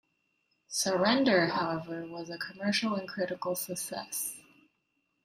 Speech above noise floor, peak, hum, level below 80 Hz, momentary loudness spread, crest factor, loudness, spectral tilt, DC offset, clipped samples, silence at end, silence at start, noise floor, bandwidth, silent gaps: 47 dB; -14 dBFS; none; -72 dBFS; 14 LU; 20 dB; -31 LUFS; -3.5 dB/octave; under 0.1%; under 0.1%; 0.85 s; 0.7 s; -78 dBFS; 16 kHz; none